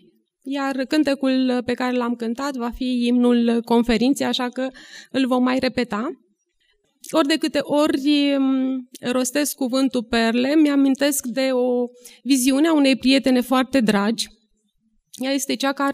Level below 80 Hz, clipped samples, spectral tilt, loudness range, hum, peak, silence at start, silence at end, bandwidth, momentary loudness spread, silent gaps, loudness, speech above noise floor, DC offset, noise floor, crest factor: -52 dBFS; under 0.1%; -3.5 dB/octave; 3 LU; none; -2 dBFS; 0.45 s; 0 s; 15.5 kHz; 9 LU; none; -20 LUFS; 47 dB; under 0.1%; -67 dBFS; 18 dB